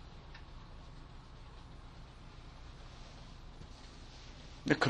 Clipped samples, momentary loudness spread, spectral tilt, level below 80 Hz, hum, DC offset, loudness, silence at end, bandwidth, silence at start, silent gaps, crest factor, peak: under 0.1%; 2 LU; -5.5 dB/octave; -54 dBFS; none; under 0.1%; -49 LUFS; 0 s; 11 kHz; 0 s; none; 30 dB; -14 dBFS